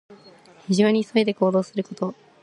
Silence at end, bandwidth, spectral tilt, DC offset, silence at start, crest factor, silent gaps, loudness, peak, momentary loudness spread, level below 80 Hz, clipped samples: 0.3 s; 11 kHz; -6 dB/octave; under 0.1%; 0.1 s; 18 dB; none; -22 LUFS; -6 dBFS; 11 LU; -70 dBFS; under 0.1%